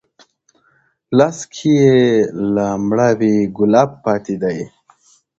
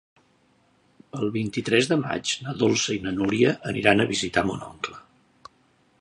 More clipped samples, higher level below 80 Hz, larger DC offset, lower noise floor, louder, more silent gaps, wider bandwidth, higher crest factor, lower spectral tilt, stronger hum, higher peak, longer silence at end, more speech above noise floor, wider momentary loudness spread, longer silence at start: neither; about the same, -54 dBFS vs -56 dBFS; neither; second, -59 dBFS vs -63 dBFS; first, -15 LUFS vs -24 LUFS; neither; second, 8.2 kHz vs 11.5 kHz; second, 16 dB vs 24 dB; first, -6.5 dB/octave vs -4.5 dB/octave; neither; about the same, 0 dBFS vs -2 dBFS; second, 0.7 s vs 1 s; first, 45 dB vs 39 dB; about the same, 10 LU vs 12 LU; about the same, 1.1 s vs 1.15 s